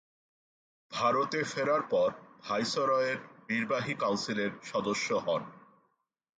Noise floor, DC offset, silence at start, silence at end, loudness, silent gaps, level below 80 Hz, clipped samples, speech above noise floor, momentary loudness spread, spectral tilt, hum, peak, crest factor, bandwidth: -80 dBFS; under 0.1%; 0.9 s; 0.8 s; -31 LUFS; none; -74 dBFS; under 0.1%; 49 dB; 7 LU; -4 dB/octave; none; -14 dBFS; 18 dB; 9.4 kHz